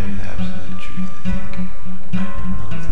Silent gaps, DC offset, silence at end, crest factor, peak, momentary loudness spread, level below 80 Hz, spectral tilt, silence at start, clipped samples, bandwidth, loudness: none; 40%; 0 s; 16 dB; -2 dBFS; 5 LU; -32 dBFS; -7 dB/octave; 0 s; under 0.1%; 10.5 kHz; -28 LUFS